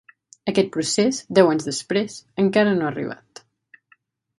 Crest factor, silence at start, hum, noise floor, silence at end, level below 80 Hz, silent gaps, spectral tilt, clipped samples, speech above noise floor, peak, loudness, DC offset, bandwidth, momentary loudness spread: 20 dB; 0.45 s; none; -61 dBFS; 1.25 s; -66 dBFS; none; -4.5 dB/octave; under 0.1%; 41 dB; -2 dBFS; -21 LUFS; under 0.1%; 11.5 kHz; 13 LU